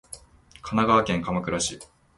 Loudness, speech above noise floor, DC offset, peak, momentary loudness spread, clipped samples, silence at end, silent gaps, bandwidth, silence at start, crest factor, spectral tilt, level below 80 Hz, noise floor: -24 LUFS; 27 dB; under 0.1%; -6 dBFS; 23 LU; under 0.1%; 0.35 s; none; 11.5 kHz; 0.1 s; 20 dB; -4.5 dB/octave; -50 dBFS; -51 dBFS